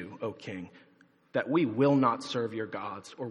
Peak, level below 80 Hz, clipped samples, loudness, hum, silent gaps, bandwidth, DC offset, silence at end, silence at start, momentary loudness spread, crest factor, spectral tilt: -12 dBFS; -78 dBFS; under 0.1%; -30 LUFS; none; none; 10.5 kHz; under 0.1%; 0 s; 0 s; 16 LU; 20 dB; -6.5 dB/octave